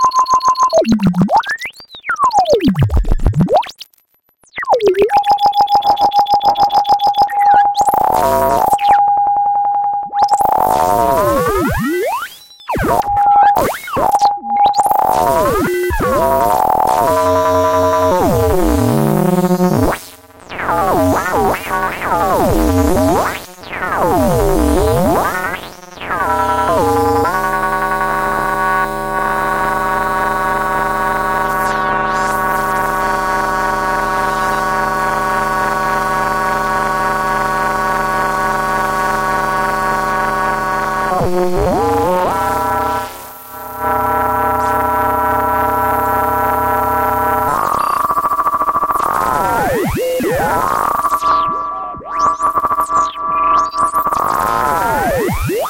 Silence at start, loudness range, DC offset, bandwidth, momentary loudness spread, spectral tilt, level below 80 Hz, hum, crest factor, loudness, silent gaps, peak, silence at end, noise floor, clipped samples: 0 s; 3 LU; under 0.1%; 17 kHz; 5 LU; -5 dB/octave; -30 dBFS; none; 12 dB; -14 LUFS; none; -2 dBFS; 0 s; -56 dBFS; under 0.1%